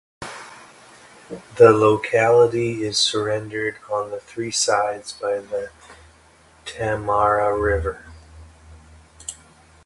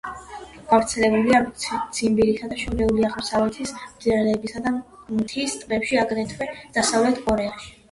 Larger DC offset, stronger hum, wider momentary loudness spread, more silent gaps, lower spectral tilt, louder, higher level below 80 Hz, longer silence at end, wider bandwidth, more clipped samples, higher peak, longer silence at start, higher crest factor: neither; neither; first, 22 LU vs 12 LU; neither; about the same, -4 dB/octave vs -4 dB/octave; about the same, -20 LUFS vs -22 LUFS; about the same, -44 dBFS vs -44 dBFS; first, 0.55 s vs 0.2 s; about the same, 11.5 kHz vs 11.5 kHz; neither; first, 0 dBFS vs -4 dBFS; first, 0.2 s vs 0.05 s; about the same, 22 dB vs 18 dB